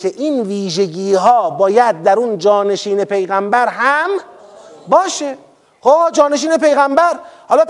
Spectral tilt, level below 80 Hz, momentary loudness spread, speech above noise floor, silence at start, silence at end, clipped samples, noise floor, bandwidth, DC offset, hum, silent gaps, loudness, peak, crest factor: -4 dB/octave; -68 dBFS; 8 LU; 25 dB; 0 s; 0 s; 0.1%; -38 dBFS; 11.5 kHz; under 0.1%; none; none; -14 LUFS; 0 dBFS; 14 dB